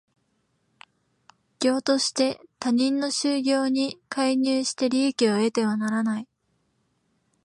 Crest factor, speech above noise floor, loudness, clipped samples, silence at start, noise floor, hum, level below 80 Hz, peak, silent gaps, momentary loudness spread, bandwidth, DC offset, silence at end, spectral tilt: 18 dB; 48 dB; -24 LUFS; under 0.1%; 1.6 s; -71 dBFS; none; -76 dBFS; -8 dBFS; none; 5 LU; 11.5 kHz; under 0.1%; 1.2 s; -3.5 dB/octave